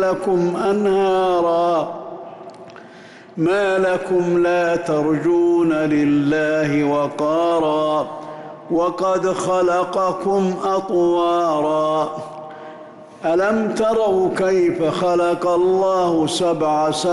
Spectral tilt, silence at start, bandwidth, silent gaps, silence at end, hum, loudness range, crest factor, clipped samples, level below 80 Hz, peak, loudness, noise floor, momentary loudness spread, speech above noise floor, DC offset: -6 dB/octave; 0 s; 11.5 kHz; none; 0 s; none; 3 LU; 8 dB; under 0.1%; -54 dBFS; -10 dBFS; -18 LUFS; -41 dBFS; 14 LU; 24 dB; under 0.1%